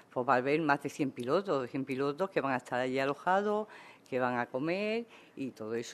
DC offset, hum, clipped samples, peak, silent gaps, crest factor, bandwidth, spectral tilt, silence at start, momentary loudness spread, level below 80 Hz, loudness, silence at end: under 0.1%; none; under 0.1%; -12 dBFS; none; 20 dB; 13.5 kHz; -6 dB/octave; 0.15 s; 10 LU; -78 dBFS; -33 LUFS; 0 s